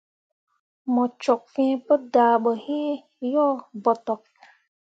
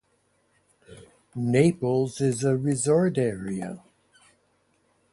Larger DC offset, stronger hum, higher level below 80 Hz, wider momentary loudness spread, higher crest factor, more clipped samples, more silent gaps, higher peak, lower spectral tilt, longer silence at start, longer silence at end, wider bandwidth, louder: neither; neither; second, -80 dBFS vs -62 dBFS; second, 11 LU vs 14 LU; about the same, 18 dB vs 18 dB; neither; neither; about the same, -6 dBFS vs -8 dBFS; about the same, -6 dB/octave vs -6.5 dB/octave; about the same, 0.85 s vs 0.9 s; second, 0.7 s vs 1.35 s; second, 8 kHz vs 11.5 kHz; about the same, -23 LUFS vs -24 LUFS